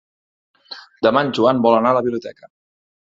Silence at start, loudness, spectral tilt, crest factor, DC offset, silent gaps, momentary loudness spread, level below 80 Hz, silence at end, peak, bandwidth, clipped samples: 0.7 s; -17 LUFS; -6.5 dB/octave; 18 dB; under 0.1%; none; 22 LU; -60 dBFS; 0.6 s; -2 dBFS; 7.6 kHz; under 0.1%